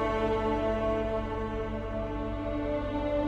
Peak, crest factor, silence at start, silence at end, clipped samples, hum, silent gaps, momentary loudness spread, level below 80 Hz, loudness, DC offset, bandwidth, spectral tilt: -18 dBFS; 12 dB; 0 s; 0 s; under 0.1%; 50 Hz at -45 dBFS; none; 6 LU; -40 dBFS; -31 LUFS; under 0.1%; 8.6 kHz; -8 dB/octave